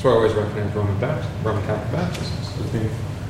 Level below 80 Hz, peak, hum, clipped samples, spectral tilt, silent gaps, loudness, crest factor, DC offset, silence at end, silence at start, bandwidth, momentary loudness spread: -40 dBFS; -4 dBFS; none; under 0.1%; -7 dB/octave; none; -23 LUFS; 16 dB; under 0.1%; 0 s; 0 s; 13.5 kHz; 7 LU